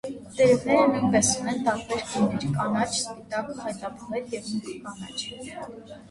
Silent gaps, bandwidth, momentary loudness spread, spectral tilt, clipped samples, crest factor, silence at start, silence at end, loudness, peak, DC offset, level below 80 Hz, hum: none; 11.5 kHz; 17 LU; -4 dB/octave; under 0.1%; 18 dB; 0.05 s; 0.05 s; -25 LUFS; -8 dBFS; under 0.1%; -56 dBFS; none